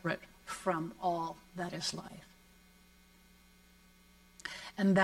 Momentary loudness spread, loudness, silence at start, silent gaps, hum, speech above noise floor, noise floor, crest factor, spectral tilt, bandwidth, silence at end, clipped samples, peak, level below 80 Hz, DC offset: 18 LU; -38 LUFS; 0.05 s; none; 60 Hz at -65 dBFS; 25 dB; -63 dBFS; 26 dB; -5 dB/octave; 15.5 kHz; 0 s; under 0.1%; -12 dBFS; -68 dBFS; under 0.1%